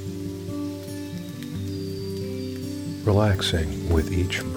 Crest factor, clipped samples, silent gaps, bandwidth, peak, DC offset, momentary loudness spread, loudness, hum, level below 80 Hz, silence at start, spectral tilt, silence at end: 18 dB; under 0.1%; none; 17 kHz; -8 dBFS; under 0.1%; 12 LU; -27 LUFS; none; -38 dBFS; 0 s; -6 dB/octave; 0 s